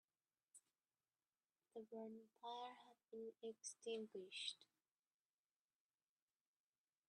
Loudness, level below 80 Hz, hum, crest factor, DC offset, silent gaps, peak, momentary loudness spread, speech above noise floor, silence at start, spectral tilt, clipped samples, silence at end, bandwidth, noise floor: -54 LUFS; under -90 dBFS; none; 24 dB; under 0.1%; none; -34 dBFS; 11 LU; over 35 dB; 0.55 s; -2 dB/octave; under 0.1%; 2.45 s; 10 kHz; under -90 dBFS